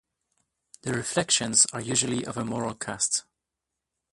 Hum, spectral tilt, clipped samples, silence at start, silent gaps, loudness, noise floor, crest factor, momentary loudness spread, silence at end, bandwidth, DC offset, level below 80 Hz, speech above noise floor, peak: none; -2 dB/octave; under 0.1%; 0.85 s; none; -25 LUFS; -86 dBFS; 24 dB; 11 LU; 0.9 s; 11.5 kHz; under 0.1%; -62 dBFS; 59 dB; -4 dBFS